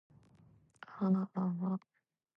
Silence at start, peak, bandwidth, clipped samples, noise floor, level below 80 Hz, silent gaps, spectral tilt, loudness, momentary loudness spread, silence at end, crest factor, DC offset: 0.9 s; -22 dBFS; 5.4 kHz; under 0.1%; -65 dBFS; -82 dBFS; none; -10.5 dB/octave; -36 LUFS; 18 LU; 0.6 s; 16 dB; under 0.1%